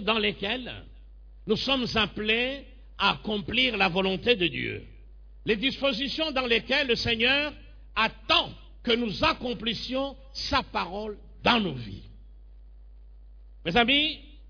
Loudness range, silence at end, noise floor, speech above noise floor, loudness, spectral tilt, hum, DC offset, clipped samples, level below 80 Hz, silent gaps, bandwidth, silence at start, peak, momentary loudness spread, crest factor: 5 LU; 0 s; -48 dBFS; 21 dB; -26 LUFS; -4.5 dB/octave; none; under 0.1%; under 0.1%; -46 dBFS; none; 5.4 kHz; 0 s; -8 dBFS; 14 LU; 20 dB